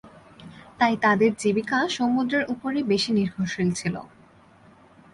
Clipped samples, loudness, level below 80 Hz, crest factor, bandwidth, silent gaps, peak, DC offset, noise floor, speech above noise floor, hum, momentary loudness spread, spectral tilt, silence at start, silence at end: under 0.1%; -23 LUFS; -60 dBFS; 18 dB; 11.5 kHz; none; -6 dBFS; under 0.1%; -53 dBFS; 30 dB; none; 7 LU; -5 dB/octave; 0.05 s; 1.05 s